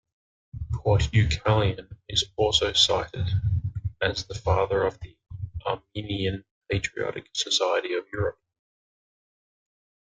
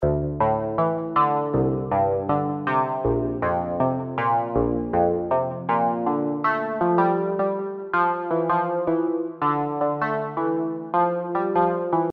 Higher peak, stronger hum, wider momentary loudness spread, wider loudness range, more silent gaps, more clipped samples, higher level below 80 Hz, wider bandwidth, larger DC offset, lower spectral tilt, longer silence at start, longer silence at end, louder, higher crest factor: about the same, -6 dBFS vs -6 dBFS; neither; first, 13 LU vs 3 LU; first, 5 LU vs 1 LU; first, 6.51-6.61 s vs none; neither; about the same, -42 dBFS vs -44 dBFS; first, 9.4 kHz vs 5.2 kHz; neither; second, -4.5 dB/octave vs -10.5 dB/octave; first, 0.55 s vs 0 s; first, 1.75 s vs 0 s; second, -26 LUFS vs -23 LUFS; about the same, 20 dB vs 16 dB